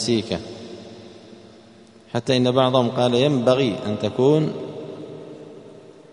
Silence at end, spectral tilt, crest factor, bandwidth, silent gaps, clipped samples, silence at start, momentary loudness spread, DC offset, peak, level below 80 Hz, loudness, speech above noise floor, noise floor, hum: 0.25 s; -6 dB/octave; 20 dB; 10.5 kHz; none; under 0.1%; 0 s; 22 LU; under 0.1%; -2 dBFS; -58 dBFS; -20 LUFS; 29 dB; -48 dBFS; none